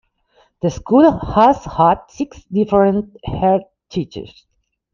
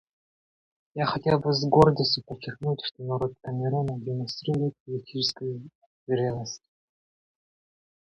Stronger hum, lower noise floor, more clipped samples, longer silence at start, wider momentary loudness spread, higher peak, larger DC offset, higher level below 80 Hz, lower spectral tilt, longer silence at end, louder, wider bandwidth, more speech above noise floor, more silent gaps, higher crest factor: neither; second, -57 dBFS vs under -90 dBFS; neither; second, 0.65 s vs 0.95 s; about the same, 15 LU vs 17 LU; first, -2 dBFS vs -6 dBFS; neither; first, -40 dBFS vs -56 dBFS; about the same, -7.5 dB/octave vs -6.5 dB/octave; second, 0.65 s vs 1.5 s; first, -16 LUFS vs -27 LUFS; second, 7.2 kHz vs 10.5 kHz; second, 42 dB vs over 64 dB; second, none vs 4.80-4.86 s, 5.75-6.07 s; second, 16 dB vs 22 dB